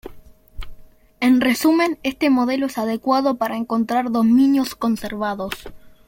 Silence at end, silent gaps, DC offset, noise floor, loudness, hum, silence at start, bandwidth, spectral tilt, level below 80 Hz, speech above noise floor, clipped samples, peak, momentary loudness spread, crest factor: 0.2 s; none; under 0.1%; -42 dBFS; -19 LUFS; none; 0.05 s; 17 kHz; -5 dB/octave; -44 dBFS; 23 dB; under 0.1%; -6 dBFS; 9 LU; 14 dB